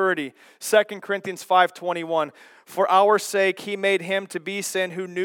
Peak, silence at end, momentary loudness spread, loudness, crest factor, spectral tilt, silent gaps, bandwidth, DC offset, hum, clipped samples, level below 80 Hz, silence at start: -2 dBFS; 0 s; 10 LU; -22 LUFS; 20 dB; -3 dB/octave; none; 18 kHz; under 0.1%; none; under 0.1%; -86 dBFS; 0 s